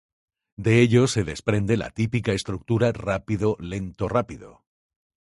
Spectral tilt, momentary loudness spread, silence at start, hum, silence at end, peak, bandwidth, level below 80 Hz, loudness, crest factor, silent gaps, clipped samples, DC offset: -6.5 dB/octave; 11 LU; 0.6 s; none; 0.8 s; -4 dBFS; 11.5 kHz; -46 dBFS; -23 LUFS; 20 dB; none; under 0.1%; under 0.1%